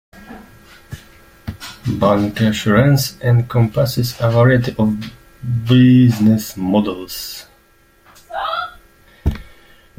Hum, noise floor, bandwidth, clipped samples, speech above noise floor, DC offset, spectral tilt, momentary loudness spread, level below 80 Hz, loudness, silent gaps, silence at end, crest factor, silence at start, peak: none; -52 dBFS; 16.5 kHz; under 0.1%; 38 dB; under 0.1%; -6.5 dB/octave; 21 LU; -38 dBFS; -16 LUFS; none; 0.55 s; 16 dB; 0.15 s; -2 dBFS